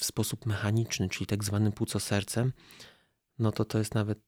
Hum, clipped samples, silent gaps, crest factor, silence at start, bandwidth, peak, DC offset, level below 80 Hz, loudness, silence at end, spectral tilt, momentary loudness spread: none; under 0.1%; none; 14 dB; 0 s; 16.5 kHz; -16 dBFS; under 0.1%; -60 dBFS; -31 LUFS; 0.1 s; -5 dB/octave; 4 LU